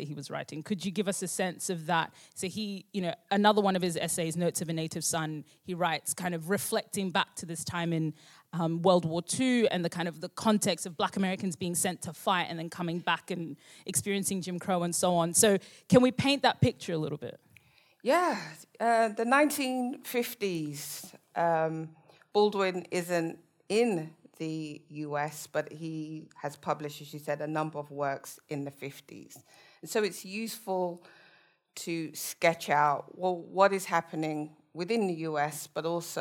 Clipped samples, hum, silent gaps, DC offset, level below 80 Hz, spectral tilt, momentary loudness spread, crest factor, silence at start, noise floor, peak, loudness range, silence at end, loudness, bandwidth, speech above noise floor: under 0.1%; none; none; under 0.1%; -70 dBFS; -4 dB/octave; 14 LU; 24 dB; 0 s; -64 dBFS; -8 dBFS; 9 LU; 0 s; -30 LUFS; 18.5 kHz; 33 dB